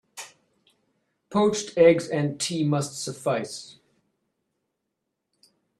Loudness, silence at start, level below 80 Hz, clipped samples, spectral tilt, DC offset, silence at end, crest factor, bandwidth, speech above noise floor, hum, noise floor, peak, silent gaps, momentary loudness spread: -24 LUFS; 0.15 s; -68 dBFS; under 0.1%; -5 dB/octave; under 0.1%; 2.1 s; 22 dB; 13 kHz; 58 dB; none; -81 dBFS; -6 dBFS; none; 21 LU